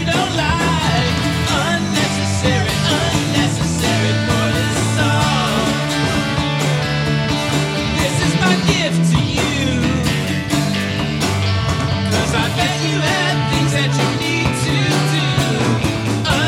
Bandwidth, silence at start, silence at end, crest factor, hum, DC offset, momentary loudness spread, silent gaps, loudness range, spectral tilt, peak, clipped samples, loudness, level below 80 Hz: 16.5 kHz; 0 s; 0 s; 16 dB; none; under 0.1%; 3 LU; none; 1 LU; -4.5 dB/octave; 0 dBFS; under 0.1%; -16 LUFS; -36 dBFS